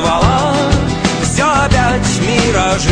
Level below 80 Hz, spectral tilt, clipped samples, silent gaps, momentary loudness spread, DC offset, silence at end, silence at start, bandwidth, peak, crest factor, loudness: -24 dBFS; -4.5 dB/octave; under 0.1%; none; 3 LU; under 0.1%; 0 s; 0 s; 10.5 kHz; 0 dBFS; 12 dB; -13 LUFS